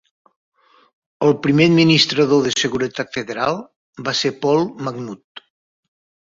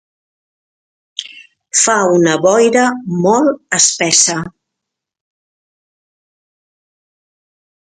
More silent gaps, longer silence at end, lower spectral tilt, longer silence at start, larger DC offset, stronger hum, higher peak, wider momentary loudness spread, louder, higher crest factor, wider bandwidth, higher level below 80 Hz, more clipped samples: first, 3.76-3.93 s, 5.24-5.35 s vs none; second, 1 s vs 3.35 s; first, -5 dB/octave vs -2.5 dB/octave; about the same, 1.2 s vs 1.2 s; neither; neither; about the same, -2 dBFS vs 0 dBFS; about the same, 15 LU vs 17 LU; second, -17 LUFS vs -12 LUFS; about the same, 18 dB vs 16 dB; second, 7.8 kHz vs 11.5 kHz; about the same, -58 dBFS vs -60 dBFS; neither